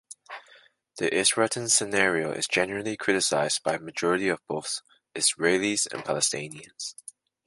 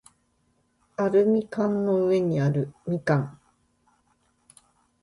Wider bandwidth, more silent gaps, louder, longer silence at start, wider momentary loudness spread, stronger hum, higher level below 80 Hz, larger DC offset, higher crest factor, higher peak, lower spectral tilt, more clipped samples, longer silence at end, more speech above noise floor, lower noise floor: about the same, 12 kHz vs 11.5 kHz; neither; about the same, -25 LUFS vs -24 LUFS; second, 0.1 s vs 1 s; first, 16 LU vs 8 LU; neither; about the same, -66 dBFS vs -64 dBFS; neither; first, 22 dB vs 16 dB; first, -6 dBFS vs -10 dBFS; second, -2 dB/octave vs -8.5 dB/octave; neither; second, 0.55 s vs 1.65 s; second, 31 dB vs 46 dB; second, -57 dBFS vs -69 dBFS